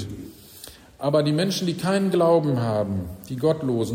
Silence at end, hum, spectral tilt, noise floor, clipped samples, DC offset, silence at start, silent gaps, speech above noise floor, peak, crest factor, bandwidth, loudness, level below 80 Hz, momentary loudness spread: 0 s; none; -6.5 dB/octave; -45 dBFS; under 0.1%; under 0.1%; 0 s; none; 23 dB; -8 dBFS; 16 dB; 16 kHz; -23 LUFS; -54 dBFS; 22 LU